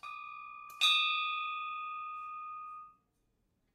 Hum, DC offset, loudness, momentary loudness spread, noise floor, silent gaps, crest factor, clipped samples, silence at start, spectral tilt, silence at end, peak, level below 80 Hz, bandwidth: none; under 0.1%; -32 LUFS; 20 LU; -78 dBFS; none; 22 dB; under 0.1%; 0.05 s; 3.5 dB/octave; 0.85 s; -16 dBFS; -82 dBFS; 16 kHz